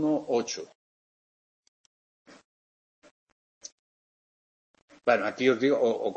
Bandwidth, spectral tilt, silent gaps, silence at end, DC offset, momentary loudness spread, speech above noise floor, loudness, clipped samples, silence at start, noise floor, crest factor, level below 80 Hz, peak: 8.4 kHz; -4.5 dB/octave; 0.75-2.25 s, 2.44-3.02 s, 3.11-3.61 s, 3.72-4.74 s, 4.82-4.88 s; 0 s; under 0.1%; 23 LU; over 64 dB; -27 LUFS; under 0.1%; 0 s; under -90 dBFS; 22 dB; -80 dBFS; -8 dBFS